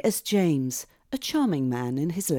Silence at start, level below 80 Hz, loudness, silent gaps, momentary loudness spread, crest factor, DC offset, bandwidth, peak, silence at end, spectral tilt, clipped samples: 0.05 s; -64 dBFS; -26 LUFS; none; 9 LU; 14 dB; under 0.1%; over 20 kHz; -12 dBFS; 0 s; -5 dB/octave; under 0.1%